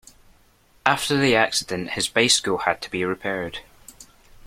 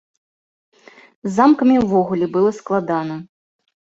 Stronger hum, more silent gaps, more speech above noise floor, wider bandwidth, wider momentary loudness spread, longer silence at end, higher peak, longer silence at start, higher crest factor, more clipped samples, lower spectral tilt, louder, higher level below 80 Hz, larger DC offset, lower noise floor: neither; neither; second, 35 dB vs over 74 dB; first, 16.5 kHz vs 7.8 kHz; second, 10 LU vs 14 LU; second, 0.45 s vs 0.7 s; about the same, 0 dBFS vs -2 dBFS; second, 0.85 s vs 1.25 s; first, 24 dB vs 18 dB; neither; second, -2.5 dB/octave vs -7.5 dB/octave; second, -21 LUFS vs -17 LUFS; about the same, -54 dBFS vs -56 dBFS; neither; second, -57 dBFS vs under -90 dBFS